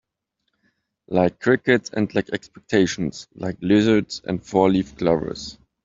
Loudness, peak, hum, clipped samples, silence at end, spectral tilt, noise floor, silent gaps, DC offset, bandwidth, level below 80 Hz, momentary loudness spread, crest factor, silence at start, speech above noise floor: -21 LUFS; -2 dBFS; none; under 0.1%; 0.3 s; -6 dB/octave; -77 dBFS; none; under 0.1%; 7.8 kHz; -52 dBFS; 13 LU; 20 dB; 1.1 s; 56 dB